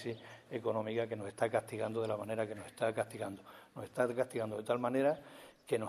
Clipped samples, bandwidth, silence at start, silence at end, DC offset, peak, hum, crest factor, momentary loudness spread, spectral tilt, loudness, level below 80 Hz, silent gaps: under 0.1%; 13.5 kHz; 0 s; 0 s; under 0.1%; -18 dBFS; none; 18 dB; 13 LU; -6 dB/octave; -37 LUFS; -78 dBFS; none